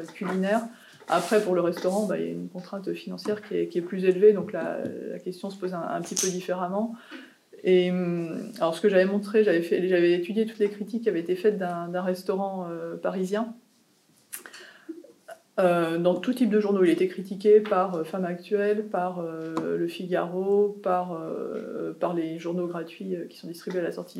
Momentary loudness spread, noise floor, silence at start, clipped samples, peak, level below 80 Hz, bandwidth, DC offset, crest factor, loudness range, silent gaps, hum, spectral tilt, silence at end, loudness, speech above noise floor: 13 LU; -63 dBFS; 0 s; under 0.1%; -8 dBFS; -88 dBFS; 15 kHz; under 0.1%; 18 dB; 7 LU; none; none; -5.5 dB/octave; 0 s; -26 LUFS; 37 dB